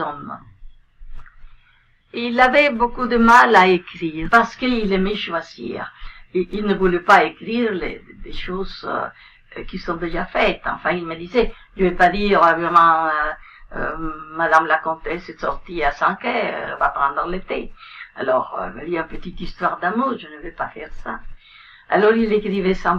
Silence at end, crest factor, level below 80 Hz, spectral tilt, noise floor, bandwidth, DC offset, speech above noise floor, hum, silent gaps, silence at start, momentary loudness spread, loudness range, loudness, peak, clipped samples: 0 s; 20 dB; -36 dBFS; -6 dB/octave; -56 dBFS; 12.5 kHz; under 0.1%; 37 dB; none; none; 0 s; 19 LU; 9 LU; -19 LUFS; 0 dBFS; under 0.1%